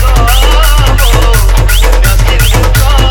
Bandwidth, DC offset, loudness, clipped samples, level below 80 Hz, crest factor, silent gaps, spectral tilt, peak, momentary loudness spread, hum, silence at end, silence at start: 18.5 kHz; under 0.1%; -8 LUFS; 0.6%; -6 dBFS; 4 dB; none; -4 dB/octave; 0 dBFS; 1 LU; none; 0 s; 0 s